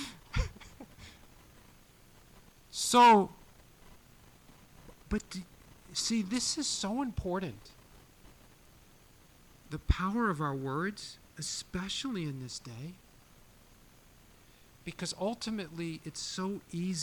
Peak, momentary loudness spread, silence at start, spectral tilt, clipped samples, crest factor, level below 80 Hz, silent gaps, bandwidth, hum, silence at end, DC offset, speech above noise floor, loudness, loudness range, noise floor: -16 dBFS; 19 LU; 0 s; -4 dB/octave; under 0.1%; 20 dB; -48 dBFS; none; 17.5 kHz; none; 0 s; under 0.1%; 28 dB; -32 LUFS; 12 LU; -59 dBFS